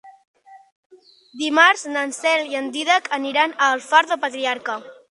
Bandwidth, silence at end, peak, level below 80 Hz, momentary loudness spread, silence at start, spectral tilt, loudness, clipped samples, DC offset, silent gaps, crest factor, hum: 11.5 kHz; 0.15 s; 0 dBFS; -78 dBFS; 11 LU; 0.05 s; -0.5 dB/octave; -19 LUFS; under 0.1%; under 0.1%; 0.27-0.34 s, 0.72-0.90 s; 22 dB; none